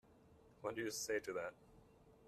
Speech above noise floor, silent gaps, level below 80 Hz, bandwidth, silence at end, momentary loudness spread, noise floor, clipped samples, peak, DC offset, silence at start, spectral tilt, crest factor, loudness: 23 dB; none; -76 dBFS; 15 kHz; 0 s; 8 LU; -67 dBFS; under 0.1%; -28 dBFS; under 0.1%; 0.1 s; -3 dB/octave; 20 dB; -45 LUFS